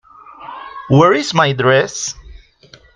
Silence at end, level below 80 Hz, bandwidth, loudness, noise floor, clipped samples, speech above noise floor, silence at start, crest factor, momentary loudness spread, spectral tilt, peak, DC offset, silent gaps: 0.6 s; -46 dBFS; 9.8 kHz; -14 LUFS; -46 dBFS; under 0.1%; 33 dB; 0.4 s; 16 dB; 22 LU; -5 dB/octave; 0 dBFS; under 0.1%; none